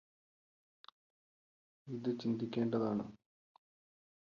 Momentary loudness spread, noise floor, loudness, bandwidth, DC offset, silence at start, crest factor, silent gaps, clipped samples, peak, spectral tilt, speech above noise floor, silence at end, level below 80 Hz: 10 LU; under -90 dBFS; -38 LUFS; 7 kHz; under 0.1%; 1.85 s; 18 dB; none; under 0.1%; -24 dBFS; -7 dB/octave; over 53 dB; 1.2 s; -78 dBFS